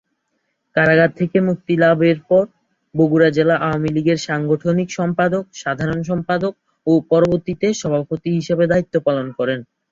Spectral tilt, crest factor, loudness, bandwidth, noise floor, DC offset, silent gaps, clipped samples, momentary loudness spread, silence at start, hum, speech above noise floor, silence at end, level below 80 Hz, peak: -6.5 dB/octave; 16 dB; -18 LUFS; 7.6 kHz; -71 dBFS; under 0.1%; none; under 0.1%; 8 LU; 0.75 s; none; 54 dB; 0.3 s; -52 dBFS; -2 dBFS